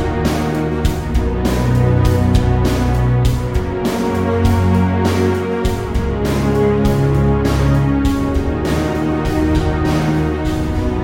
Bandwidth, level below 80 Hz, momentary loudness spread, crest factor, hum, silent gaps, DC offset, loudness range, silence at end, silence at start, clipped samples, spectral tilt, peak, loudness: 17 kHz; -22 dBFS; 5 LU; 14 dB; none; none; under 0.1%; 1 LU; 0 s; 0 s; under 0.1%; -7.5 dB/octave; -2 dBFS; -16 LUFS